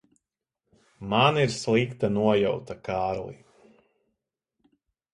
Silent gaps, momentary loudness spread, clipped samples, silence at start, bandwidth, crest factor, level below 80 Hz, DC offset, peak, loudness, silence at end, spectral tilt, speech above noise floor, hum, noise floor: none; 12 LU; under 0.1%; 1 s; 11.5 kHz; 22 dB; -58 dBFS; under 0.1%; -6 dBFS; -25 LUFS; 1.8 s; -5.5 dB/octave; 61 dB; none; -86 dBFS